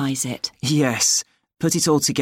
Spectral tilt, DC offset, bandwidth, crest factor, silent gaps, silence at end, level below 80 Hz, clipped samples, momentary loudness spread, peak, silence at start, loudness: -3.5 dB/octave; under 0.1%; 17 kHz; 16 dB; none; 0 s; -60 dBFS; under 0.1%; 8 LU; -6 dBFS; 0 s; -20 LUFS